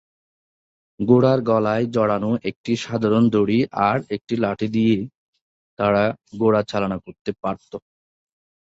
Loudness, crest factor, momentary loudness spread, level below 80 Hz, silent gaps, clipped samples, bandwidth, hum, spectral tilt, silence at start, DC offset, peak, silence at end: -21 LUFS; 18 dB; 11 LU; -56 dBFS; 2.56-2.64 s, 5.15-5.33 s, 5.41-5.77 s, 7.21-7.25 s; under 0.1%; 7.8 kHz; none; -7.5 dB/octave; 1 s; under 0.1%; -2 dBFS; 0.9 s